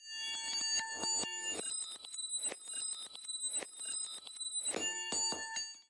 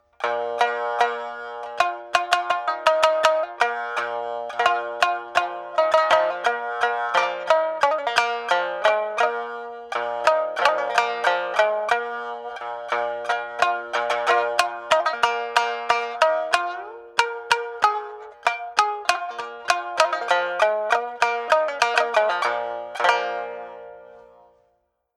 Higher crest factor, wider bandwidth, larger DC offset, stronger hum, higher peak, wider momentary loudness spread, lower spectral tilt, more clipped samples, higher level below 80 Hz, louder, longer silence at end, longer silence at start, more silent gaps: second, 16 dB vs 22 dB; second, 11.5 kHz vs 13.5 kHz; neither; neither; second, -24 dBFS vs -2 dBFS; second, 7 LU vs 10 LU; second, 1.5 dB/octave vs -0.5 dB/octave; neither; second, -82 dBFS vs -70 dBFS; second, -37 LUFS vs -22 LUFS; second, 0.05 s vs 0.95 s; second, 0 s vs 0.2 s; neither